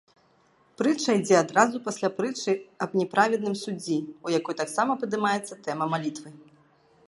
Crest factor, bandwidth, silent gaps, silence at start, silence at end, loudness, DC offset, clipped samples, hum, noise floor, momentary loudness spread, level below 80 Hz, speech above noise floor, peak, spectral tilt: 22 dB; 11.5 kHz; none; 0.8 s; 0.65 s; -26 LUFS; under 0.1%; under 0.1%; none; -63 dBFS; 9 LU; -74 dBFS; 37 dB; -4 dBFS; -4.5 dB/octave